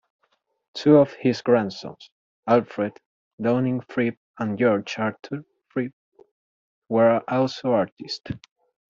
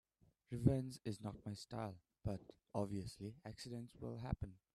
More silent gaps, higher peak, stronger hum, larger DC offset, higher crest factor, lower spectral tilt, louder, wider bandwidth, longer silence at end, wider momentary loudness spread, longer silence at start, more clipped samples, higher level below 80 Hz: first, 2.12-2.43 s, 3.06-3.38 s, 4.17-4.34 s, 5.93-6.12 s, 6.31-6.82 s, 7.92-7.97 s vs none; first, -4 dBFS vs -20 dBFS; neither; neither; second, 20 dB vs 26 dB; about the same, -7 dB/octave vs -7.5 dB/octave; first, -23 LUFS vs -46 LUFS; second, 7.6 kHz vs 13 kHz; first, 0.55 s vs 0.2 s; first, 17 LU vs 14 LU; first, 0.75 s vs 0.5 s; neither; about the same, -64 dBFS vs -60 dBFS